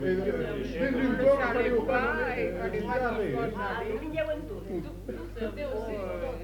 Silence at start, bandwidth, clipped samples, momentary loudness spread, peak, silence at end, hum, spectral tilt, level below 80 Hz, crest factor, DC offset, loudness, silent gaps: 0 s; 19 kHz; under 0.1%; 11 LU; -12 dBFS; 0 s; none; -7 dB/octave; -44 dBFS; 18 dB; under 0.1%; -30 LUFS; none